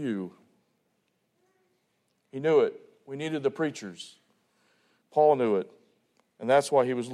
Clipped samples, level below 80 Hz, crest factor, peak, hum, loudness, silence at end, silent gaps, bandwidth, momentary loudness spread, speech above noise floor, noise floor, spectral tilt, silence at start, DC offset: under 0.1%; -80 dBFS; 20 dB; -10 dBFS; none; -27 LUFS; 0 s; none; 12.5 kHz; 20 LU; 48 dB; -75 dBFS; -5.5 dB/octave; 0 s; under 0.1%